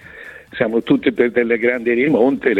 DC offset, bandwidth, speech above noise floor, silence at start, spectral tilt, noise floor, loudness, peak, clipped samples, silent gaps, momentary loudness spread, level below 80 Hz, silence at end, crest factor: under 0.1%; 4.9 kHz; 22 dB; 0.05 s; -7.5 dB/octave; -38 dBFS; -16 LUFS; -2 dBFS; under 0.1%; none; 16 LU; -54 dBFS; 0 s; 14 dB